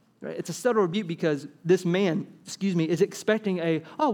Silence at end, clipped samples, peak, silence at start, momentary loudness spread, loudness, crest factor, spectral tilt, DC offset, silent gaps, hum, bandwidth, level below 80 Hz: 0 s; under 0.1%; -8 dBFS; 0.2 s; 9 LU; -26 LUFS; 18 dB; -6 dB/octave; under 0.1%; none; none; 17.5 kHz; -78 dBFS